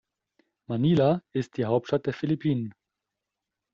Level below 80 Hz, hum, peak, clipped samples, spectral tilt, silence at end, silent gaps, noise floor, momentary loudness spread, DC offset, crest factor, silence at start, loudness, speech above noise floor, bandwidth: -62 dBFS; none; -10 dBFS; under 0.1%; -7.5 dB/octave; 1.05 s; none; -86 dBFS; 10 LU; under 0.1%; 16 dB; 0.7 s; -27 LUFS; 61 dB; 7.4 kHz